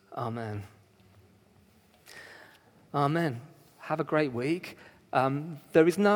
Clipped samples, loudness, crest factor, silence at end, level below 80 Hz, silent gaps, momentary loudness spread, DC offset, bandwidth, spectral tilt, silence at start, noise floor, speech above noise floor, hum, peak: under 0.1%; -29 LUFS; 22 dB; 0 s; -72 dBFS; none; 24 LU; under 0.1%; 19.5 kHz; -7 dB/octave; 0.1 s; -61 dBFS; 34 dB; none; -8 dBFS